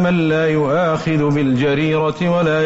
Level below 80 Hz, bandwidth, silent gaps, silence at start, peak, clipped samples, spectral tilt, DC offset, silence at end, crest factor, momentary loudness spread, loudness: -46 dBFS; 8 kHz; none; 0 s; -8 dBFS; under 0.1%; -6 dB/octave; under 0.1%; 0 s; 8 dB; 2 LU; -16 LUFS